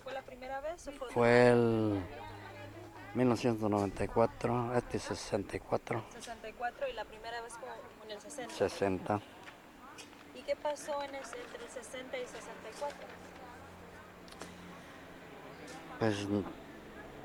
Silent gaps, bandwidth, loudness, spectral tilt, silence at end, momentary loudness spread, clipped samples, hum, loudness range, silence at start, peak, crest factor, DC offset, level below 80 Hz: none; 19 kHz; -35 LUFS; -6 dB/octave; 0 s; 19 LU; under 0.1%; none; 14 LU; 0 s; -12 dBFS; 24 dB; under 0.1%; -60 dBFS